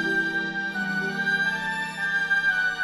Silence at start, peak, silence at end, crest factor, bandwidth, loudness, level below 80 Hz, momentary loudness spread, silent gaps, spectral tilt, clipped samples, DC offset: 0 s; -14 dBFS; 0 s; 12 dB; 13 kHz; -24 LUFS; -60 dBFS; 6 LU; none; -3.5 dB/octave; under 0.1%; under 0.1%